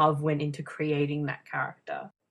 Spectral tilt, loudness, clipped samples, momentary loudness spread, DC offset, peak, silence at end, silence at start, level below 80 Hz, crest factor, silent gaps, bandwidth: -7.5 dB/octave; -31 LUFS; under 0.1%; 11 LU; under 0.1%; -10 dBFS; 0.2 s; 0 s; -68 dBFS; 20 dB; none; 11.5 kHz